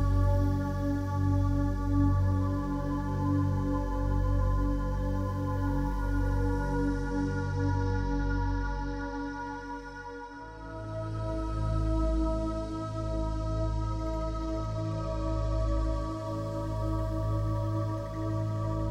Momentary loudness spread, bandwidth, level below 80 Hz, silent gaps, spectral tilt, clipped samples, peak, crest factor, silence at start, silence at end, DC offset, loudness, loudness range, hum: 8 LU; 8.8 kHz; -34 dBFS; none; -8.5 dB/octave; under 0.1%; -16 dBFS; 14 dB; 0 s; 0 s; under 0.1%; -31 LUFS; 5 LU; none